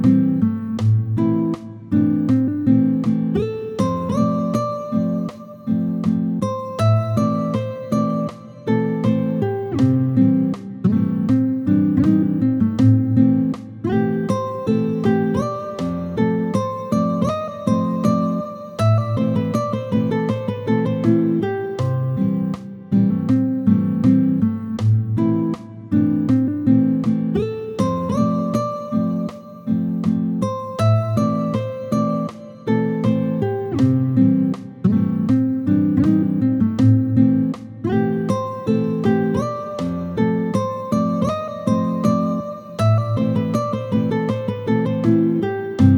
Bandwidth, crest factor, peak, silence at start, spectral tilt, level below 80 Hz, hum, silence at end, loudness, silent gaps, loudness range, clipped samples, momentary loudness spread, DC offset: 18.5 kHz; 18 dB; -2 dBFS; 0 s; -9 dB/octave; -50 dBFS; none; 0 s; -19 LUFS; none; 3 LU; under 0.1%; 8 LU; under 0.1%